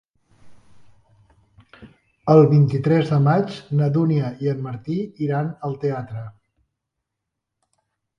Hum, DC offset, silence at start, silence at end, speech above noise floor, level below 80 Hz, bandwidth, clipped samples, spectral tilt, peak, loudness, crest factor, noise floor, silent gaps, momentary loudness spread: none; under 0.1%; 0.45 s; 1.9 s; 63 dB; -60 dBFS; 6.2 kHz; under 0.1%; -9.5 dB/octave; -2 dBFS; -20 LUFS; 20 dB; -82 dBFS; none; 15 LU